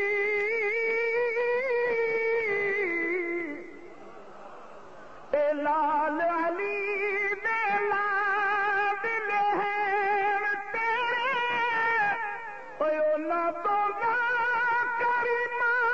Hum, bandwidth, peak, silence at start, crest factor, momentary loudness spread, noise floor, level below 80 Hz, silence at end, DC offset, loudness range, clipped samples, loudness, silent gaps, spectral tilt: none; 7.8 kHz; -14 dBFS; 0 s; 12 dB; 6 LU; -48 dBFS; -68 dBFS; 0 s; 0.4%; 4 LU; under 0.1%; -27 LUFS; none; -4.5 dB/octave